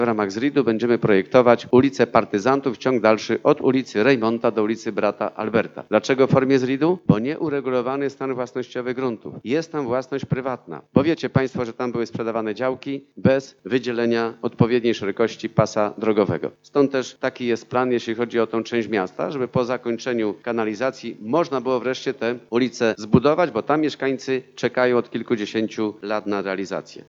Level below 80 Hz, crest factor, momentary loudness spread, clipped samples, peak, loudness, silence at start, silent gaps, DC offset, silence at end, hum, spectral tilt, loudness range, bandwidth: -60 dBFS; 20 dB; 8 LU; under 0.1%; 0 dBFS; -22 LUFS; 0 s; none; under 0.1%; 0.1 s; none; -6.5 dB/octave; 5 LU; 7.6 kHz